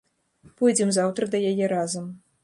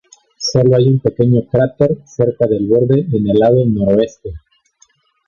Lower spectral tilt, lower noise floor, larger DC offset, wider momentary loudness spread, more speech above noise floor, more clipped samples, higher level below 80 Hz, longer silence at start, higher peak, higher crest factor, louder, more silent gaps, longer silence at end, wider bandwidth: second, -4.5 dB/octave vs -7.5 dB/octave; about the same, -57 dBFS vs -55 dBFS; neither; first, 10 LU vs 6 LU; second, 34 dB vs 42 dB; neither; second, -70 dBFS vs -42 dBFS; first, 0.6 s vs 0.4 s; second, -8 dBFS vs 0 dBFS; about the same, 16 dB vs 14 dB; second, -24 LUFS vs -14 LUFS; neither; second, 0.25 s vs 0.9 s; first, 11.5 kHz vs 7.2 kHz